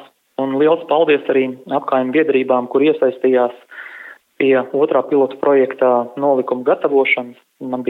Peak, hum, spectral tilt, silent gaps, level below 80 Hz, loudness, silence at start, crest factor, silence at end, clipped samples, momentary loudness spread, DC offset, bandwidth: -2 dBFS; none; -7.5 dB/octave; none; -84 dBFS; -16 LUFS; 0 s; 14 dB; 0 s; under 0.1%; 16 LU; under 0.1%; 4.1 kHz